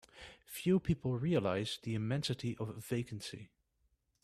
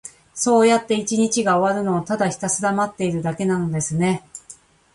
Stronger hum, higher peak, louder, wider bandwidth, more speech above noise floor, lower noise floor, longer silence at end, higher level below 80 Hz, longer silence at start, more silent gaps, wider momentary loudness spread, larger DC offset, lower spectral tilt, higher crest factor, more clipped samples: neither; second, -20 dBFS vs -4 dBFS; second, -37 LUFS vs -20 LUFS; first, 14.5 kHz vs 11.5 kHz; first, 42 dB vs 27 dB; first, -78 dBFS vs -47 dBFS; first, 0.8 s vs 0.4 s; about the same, -60 dBFS vs -56 dBFS; about the same, 0.15 s vs 0.05 s; neither; first, 14 LU vs 8 LU; neither; about the same, -6 dB/octave vs -5 dB/octave; about the same, 18 dB vs 16 dB; neither